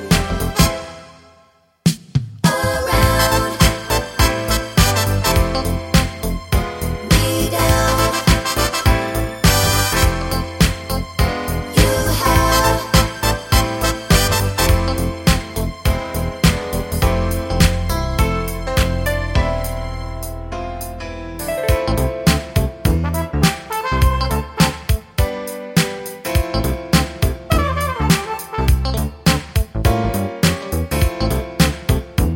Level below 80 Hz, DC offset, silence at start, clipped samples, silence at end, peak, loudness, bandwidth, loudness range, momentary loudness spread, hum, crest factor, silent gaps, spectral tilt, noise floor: -22 dBFS; under 0.1%; 0 s; under 0.1%; 0 s; 0 dBFS; -18 LUFS; 17 kHz; 4 LU; 8 LU; none; 18 dB; none; -4.5 dB/octave; -53 dBFS